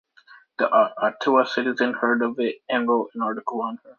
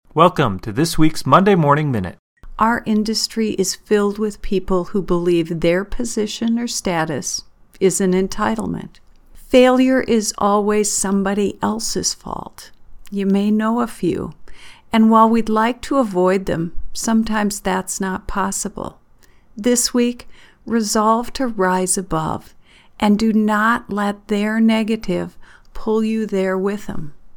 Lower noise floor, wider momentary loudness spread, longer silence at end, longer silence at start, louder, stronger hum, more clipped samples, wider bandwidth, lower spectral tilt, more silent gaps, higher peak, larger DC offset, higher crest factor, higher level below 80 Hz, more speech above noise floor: first, -52 dBFS vs -48 dBFS; second, 8 LU vs 11 LU; about the same, 0.05 s vs 0 s; first, 0.6 s vs 0.15 s; second, -23 LUFS vs -18 LUFS; neither; neither; second, 7 kHz vs 19 kHz; about the same, -5.5 dB/octave vs -4.5 dB/octave; second, none vs 2.19-2.36 s; second, -4 dBFS vs 0 dBFS; neither; about the same, 18 dB vs 18 dB; second, -76 dBFS vs -38 dBFS; about the same, 30 dB vs 31 dB